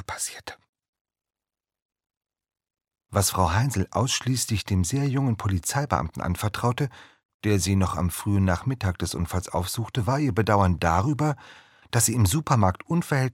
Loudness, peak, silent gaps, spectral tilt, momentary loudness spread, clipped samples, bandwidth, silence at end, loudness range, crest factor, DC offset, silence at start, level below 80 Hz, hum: -25 LUFS; -4 dBFS; 0.69-0.73 s, 0.88-0.93 s, 1.01-1.05 s, 1.82-1.89 s, 7.25-7.40 s; -5 dB/octave; 7 LU; under 0.1%; 17 kHz; 0 s; 5 LU; 22 dB; under 0.1%; 0 s; -44 dBFS; none